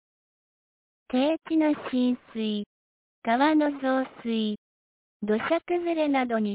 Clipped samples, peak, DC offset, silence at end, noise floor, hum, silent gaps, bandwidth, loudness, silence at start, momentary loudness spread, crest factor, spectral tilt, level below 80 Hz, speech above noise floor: under 0.1%; -12 dBFS; under 0.1%; 0 s; under -90 dBFS; none; 2.66-3.22 s, 4.58-5.20 s; 4 kHz; -26 LUFS; 1.1 s; 9 LU; 14 dB; -9.5 dB/octave; -68 dBFS; over 65 dB